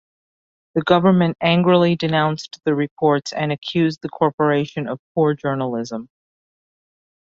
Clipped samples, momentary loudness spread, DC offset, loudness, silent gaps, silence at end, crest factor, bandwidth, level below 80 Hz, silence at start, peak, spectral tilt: under 0.1%; 11 LU; under 0.1%; -19 LUFS; 2.91-2.97 s, 4.33-4.38 s, 4.99-5.15 s; 1.25 s; 18 dB; 7.6 kHz; -58 dBFS; 0.75 s; -2 dBFS; -7 dB/octave